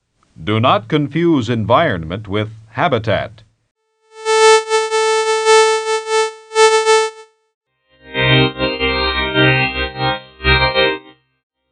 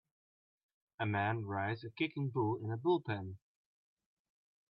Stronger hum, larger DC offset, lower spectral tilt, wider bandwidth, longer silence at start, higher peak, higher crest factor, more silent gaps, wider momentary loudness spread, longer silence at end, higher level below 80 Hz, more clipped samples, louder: neither; neither; second, -4 dB/octave vs -5.5 dB/octave; first, 10.5 kHz vs 5.4 kHz; second, 0.4 s vs 1 s; first, 0 dBFS vs -22 dBFS; about the same, 16 dB vs 18 dB; first, 3.71-3.75 s, 7.54-7.61 s vs none; first, 11 LU vs 8 LU; second, 0.7 s vs 1.35 s; first, -36 dBFS vs -78 dBFS; neither; first, -15 LUFS vs -37 LUFS